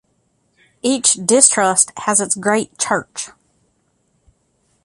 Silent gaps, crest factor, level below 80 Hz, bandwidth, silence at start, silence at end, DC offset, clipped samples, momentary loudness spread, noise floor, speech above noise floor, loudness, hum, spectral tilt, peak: none; 20 dB; -62 dBFS; 14.5 kHz; 0.85 s; 1.55 s; under 0.1%; under 0.1%; 14 LU; -64 dBFS; 47 dB; -14 LUFS; none; -2 dB/octave; 0 dBFS